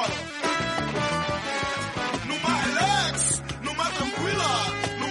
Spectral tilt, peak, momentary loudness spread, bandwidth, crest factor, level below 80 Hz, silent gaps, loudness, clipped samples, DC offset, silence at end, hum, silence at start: -3 dB/octave; -10 dBFS; 6 LU; 11.5 kHz; 16 dB; -48 dBFS; none; -25 LUFS; under 0.1%; under 0.1%; 0 s; none; 0 s